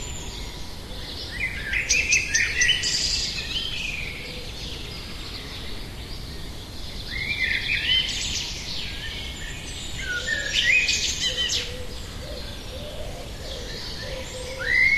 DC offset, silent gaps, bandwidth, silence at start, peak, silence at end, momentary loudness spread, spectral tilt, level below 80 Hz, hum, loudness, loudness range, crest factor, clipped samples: under 0.1%; none; 14 kHz; 0 s; -8 dBFS; 0 s; 17 LU; -1 dB/octave; -38 dBFS; none; -24 LUFS; 9 LU; 20 dB; under 0.1%